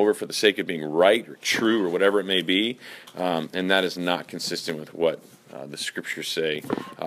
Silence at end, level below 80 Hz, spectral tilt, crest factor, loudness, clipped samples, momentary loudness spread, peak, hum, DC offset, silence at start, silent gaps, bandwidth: 0 s; -72 dBFS; -3.5 dB/octave; 22 dB; -24 LUFS; under 0.1%; 11 LU; -4 dBFS; none; under 0.1%; 0 s; none; 15.5 kHz